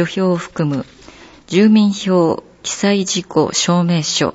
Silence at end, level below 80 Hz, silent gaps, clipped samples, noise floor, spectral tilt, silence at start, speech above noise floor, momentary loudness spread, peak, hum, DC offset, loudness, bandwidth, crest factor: 0.05 s; -54 dBFS; none; under 0.1%; -41 dBFS; -5 dB/octave; 0 s; 26 dB; 10 LU; -2 dBFS; none; under 0.1%; -16 LUFS; 8 kHz; 14 dB